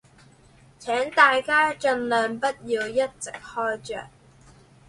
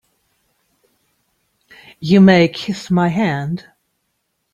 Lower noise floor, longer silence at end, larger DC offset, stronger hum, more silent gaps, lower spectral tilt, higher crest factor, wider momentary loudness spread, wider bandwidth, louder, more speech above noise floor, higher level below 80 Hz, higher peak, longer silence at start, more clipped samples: second, -54 dBFS vs -70 dBFS; second, 0.8 s vs 0.95 s; neither; neither; neither; second, -3 dB/octave vs -7 dB/octave; about the same, 22 dB vs 18 dB; about the same, 17 LU vs 16 LU; first, 11.5 kHz vs 7.4 kHz; second, -23 LUFS vs -15 LUFS; second, 30 dB vs 57 dB; about the same, -60 dBFS vs -56 dBFS; second, -4 dBFS vs 0 dBFS; second, 0.8 s vs 2 s; neither